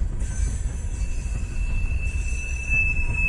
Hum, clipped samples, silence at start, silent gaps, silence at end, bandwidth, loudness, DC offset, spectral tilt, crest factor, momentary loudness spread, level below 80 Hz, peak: none; under 0.1%; 0 s; none; 0 s; 11.5 kHz; -27 LUFS; under 0.1%; -5 dB/octave; 12 dB; 9 LU; -26 dBFS; -10 dBFS